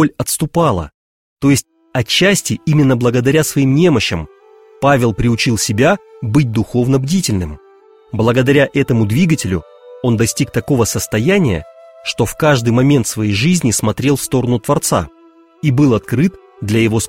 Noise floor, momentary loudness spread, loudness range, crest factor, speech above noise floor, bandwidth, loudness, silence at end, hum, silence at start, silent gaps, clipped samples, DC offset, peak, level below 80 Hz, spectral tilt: -45 dBFS; 9 LU; 2 LU; 14 dB; 32 dB; 16.5 kHz; -14 LUFS; 0 s; none; 0 s; 0.94-1.36 s; under 0.1%; under 0.1%; 0 dBFS; -38 dBFS; -5 dB/octave